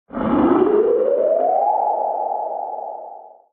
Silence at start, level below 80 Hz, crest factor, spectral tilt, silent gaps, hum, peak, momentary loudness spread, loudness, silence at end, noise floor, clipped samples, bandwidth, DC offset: 0.1 s; -52 dBFS; 14 dB; -7 dB/octave; none; none; -4 dBFS; 14 LU; -18 LUFS; 0.25 s; -38 dBFS; under 0.1%; 3.9 kHz; under 0.1%